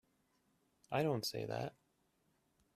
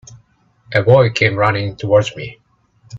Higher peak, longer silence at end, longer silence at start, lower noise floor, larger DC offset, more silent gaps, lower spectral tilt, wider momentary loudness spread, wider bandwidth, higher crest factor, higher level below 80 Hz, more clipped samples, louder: second, -22 dBFS vs 0 dBFS; first, 1.05 s vs 0 s; first, 0.9 s vs 0.1 s; first, -79 dBFS vs -55 dBFS; neither; neither; about the same, -5 dB/octave vs -6 dB/octave; second, 7 LU vs 14 LU; first, 14 kHz vs 7.8 kHz; about the same, 20 dB vs 16 dB; second, -76 dBFS vs -50 dBFS; neither; second, -40 LUFS vs -15 LUFS